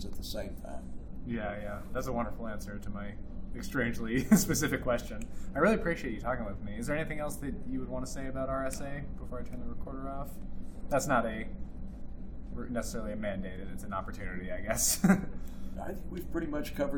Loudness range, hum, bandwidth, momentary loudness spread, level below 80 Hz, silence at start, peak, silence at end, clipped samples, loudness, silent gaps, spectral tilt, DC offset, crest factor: 8 LU; none; over 20 kHz; 17 LU; -42 dBFS; 0 s; -10 dBFS; 0 s; under 0.1%; -34 LUFS; none; -5 dB/octave; under 0.1%; 24 dB